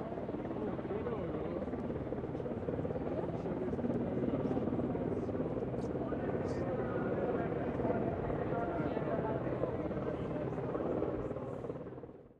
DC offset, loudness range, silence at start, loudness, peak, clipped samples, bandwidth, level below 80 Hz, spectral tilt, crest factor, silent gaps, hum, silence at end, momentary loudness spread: under 0.1%; 3 LU; 0 s; -37 LUFS; -20 dBFS; under 0.1%; 8.8 kHz; -54 dBFS; -9.5 dB/octave; 16 dB; none; none; 0.05 s; 5 LU